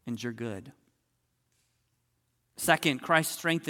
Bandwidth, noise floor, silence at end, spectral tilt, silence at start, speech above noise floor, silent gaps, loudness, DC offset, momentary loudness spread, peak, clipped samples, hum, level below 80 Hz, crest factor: 17.5 kHz; -77 dBFS; 0 s; -3.5 dB/octave; 0.05 s; 47 dB; none; -28 LUFS; under 0.1%; 13 LU; -8 dBFS; under 0.1%; none; -72 dBFS; 24 dB